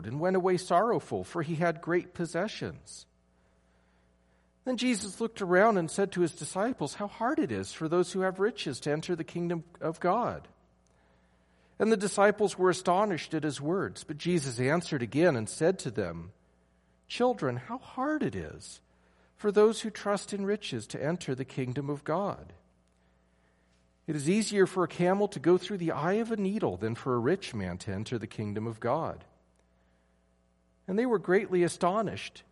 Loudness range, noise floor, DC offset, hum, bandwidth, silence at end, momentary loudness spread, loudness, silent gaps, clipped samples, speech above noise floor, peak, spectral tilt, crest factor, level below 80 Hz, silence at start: 6 LU; -69 dBFS; under 0.1%; none; 11.5 kHz; 0.1 s; 11 LU; -30 LUFS; none; under 0.1%; 39 dB; -10 dBFS; -5.5 dB/octave; 20 dB; -66 dBFS; 0 s